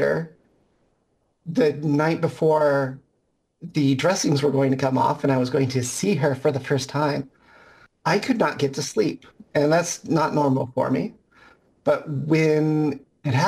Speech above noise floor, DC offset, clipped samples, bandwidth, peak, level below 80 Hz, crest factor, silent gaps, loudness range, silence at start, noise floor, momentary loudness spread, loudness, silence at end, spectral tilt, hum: 49 dB; under 0.1%; under 0.1%; 15.5 kHz; -8 dBFS; -62 dBFS; 14 dB; none; 2 LU; 0 s; -70 dBFS; 8 LU; -22 LUFS; 0 s; -6 dB/octave; none